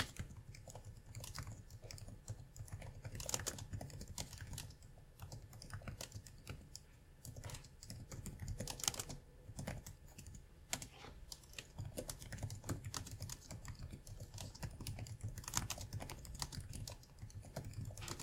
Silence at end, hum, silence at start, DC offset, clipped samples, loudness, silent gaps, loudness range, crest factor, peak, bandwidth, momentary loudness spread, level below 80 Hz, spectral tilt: 0 s; none; 0 s; under 0.1%; under 0.1%; -49 LUFS; none; 6 LU; 34 dB; -16 dBFS; 16.5 kHz; 13 LU; -58 dBFS; -3 dB/octave